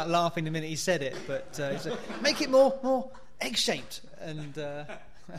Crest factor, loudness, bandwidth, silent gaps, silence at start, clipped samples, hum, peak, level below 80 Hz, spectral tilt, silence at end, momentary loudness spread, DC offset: 20 dB; -29 LUFS; 15 kHz; none; 0 s; under 0.1%; none; -12 dBFS; -60 dBFS; -4 dB/octave; 0 s; 18 LU; 0.7%